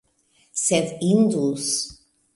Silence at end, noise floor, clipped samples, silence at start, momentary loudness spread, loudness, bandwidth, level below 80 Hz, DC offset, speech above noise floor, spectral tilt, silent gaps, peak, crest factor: 0.45 s; -63 dBFS; under 0.1%; 0.55 s; 9 LU; -22 LUFS; 11.5 kHz; -60 dBFS; under 0.1%; 42 dB; -4.5 dB/octave; none; -6 dBFS; 18 dB